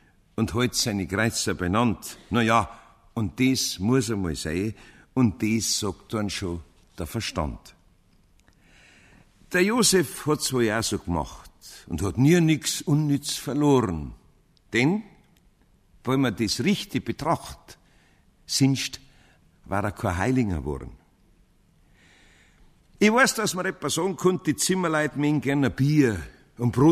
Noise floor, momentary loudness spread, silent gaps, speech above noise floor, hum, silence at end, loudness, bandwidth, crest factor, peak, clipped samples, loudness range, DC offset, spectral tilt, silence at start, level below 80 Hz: -60 dBFS; 14 LU; none; 36 dB; none; 0 s; -24 LUFS; 15.5 kHz; 20 dB; -6 dBFS; under 0.1%; 7 LU; under 0.1%; -4.5 dB/octave; 0.4 s; -48 dBFS